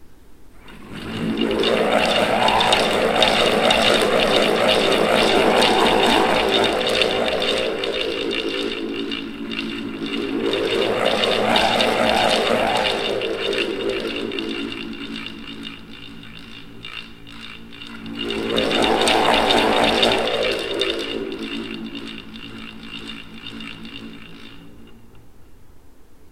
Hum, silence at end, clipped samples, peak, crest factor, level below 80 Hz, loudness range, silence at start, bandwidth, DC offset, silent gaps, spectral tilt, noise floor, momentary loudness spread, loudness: none; 0.05 s; under 0.1%; 0 dBFS; 20 dB; -46 dBFS; 17 LU; 0 s; 16.5 kHz; under 0.1%; none; -3.5 dB/octave; -41 dBFS; 19 LU; -19 LUFS